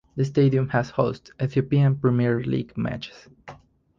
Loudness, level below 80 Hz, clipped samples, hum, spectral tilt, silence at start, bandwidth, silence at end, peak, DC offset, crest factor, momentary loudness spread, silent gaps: -23 LUFS; -54 dBFS; under 0.1%; none; -8.5 dB/octave; 0.15 s; 7.2 kHz; 0.45 s; -6 dBFS; under 0.1%; 16 dB; 10 LU; none